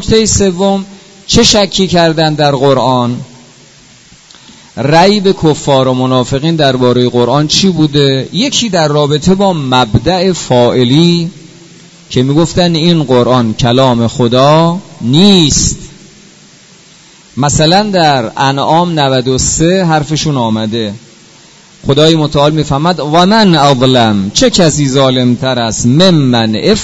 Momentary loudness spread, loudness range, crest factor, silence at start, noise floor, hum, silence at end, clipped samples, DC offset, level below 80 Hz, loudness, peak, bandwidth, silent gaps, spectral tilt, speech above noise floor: 6 LU; 4 LU; 10 dB; 0 s; -39 dBFS; none; 0 s; 0.8%; under 0.1%; -32 dBFS; -9 LUFS; 0 dBFS; 11 kHz; none; -5 dB/octave; 31 dB